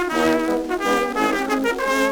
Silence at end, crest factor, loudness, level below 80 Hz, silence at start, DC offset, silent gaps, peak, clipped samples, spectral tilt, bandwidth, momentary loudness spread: 0 s; 16 dB; -20 LUFS; -46 dBFS; 0 s; under 0.1%; none; -4 dBFS; under 0.1%; -3.5 dB/octave; over 20 kHz; 2 LU